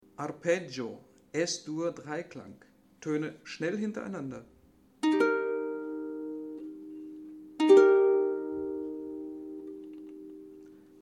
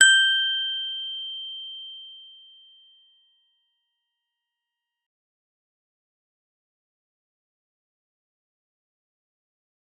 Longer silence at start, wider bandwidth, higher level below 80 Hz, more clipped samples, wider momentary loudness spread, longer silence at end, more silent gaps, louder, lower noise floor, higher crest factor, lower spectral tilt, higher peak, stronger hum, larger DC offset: first, 0.2 s vs 0 s; about the same, 10 kHz vs 9.6 kHz; first, -72 dBFS vs under -90 dBFS; neither; about the same, 22 LU vs 23 LU; second, 0.3 s vs 7.7 s; neither; second, -30 LUFS vs -23 LUFS; second, -52 dBFS vs -86 dBFS; second, 22 dB vs 28 dB; first, -5 dB/octave vs 7 dB/octave; second, -10 dBFS vs -2 dBFS; neither; neither